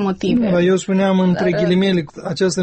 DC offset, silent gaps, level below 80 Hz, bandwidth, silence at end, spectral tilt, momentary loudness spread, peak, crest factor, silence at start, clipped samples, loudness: under 0.1%; none; -48 dBFS; 8.8 kHz; 0 s; -6 dB/octave; 5 LU; -6 dBFS; 10 dB; 0 s; under 0.1%; -17 LUFS